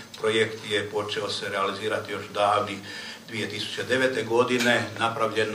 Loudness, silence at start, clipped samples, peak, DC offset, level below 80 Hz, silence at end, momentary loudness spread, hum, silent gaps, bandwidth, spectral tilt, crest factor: -26 LUFS; 0 s; under 0.1%; -6 dBFS; under 0.1%; -70 dBFS; 0 s; 10 LU; none; none; 15.5 kHz; -3.5 dB/octave; 20 dB